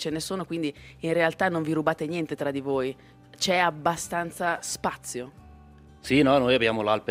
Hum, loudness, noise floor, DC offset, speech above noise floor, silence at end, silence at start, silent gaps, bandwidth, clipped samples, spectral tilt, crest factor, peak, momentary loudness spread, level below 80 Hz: none; -26 LUFS; -50 dBFS; under 0.1%; 24 dB; 0 s; 0 s; none; 16 kHz; under 0.1%; -4.5 dB/octave; 18 dB; -8 dBFS; 14 LU; -56 dBFS